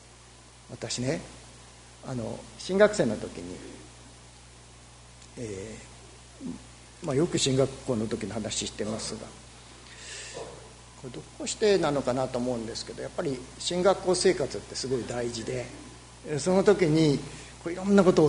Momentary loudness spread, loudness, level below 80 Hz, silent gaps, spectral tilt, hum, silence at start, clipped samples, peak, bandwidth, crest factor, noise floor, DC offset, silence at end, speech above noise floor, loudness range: 24 LU; -28 LUFS; -54 dBFS; none; -5 dB/octave; 60 Hz at -50 dBFS; 0.05 s; under 0.1%; -6 dBFS; 11 kHz; 24 dB; -52 dBFS; under 0.1%; 0 s; 24 dB; 9 LU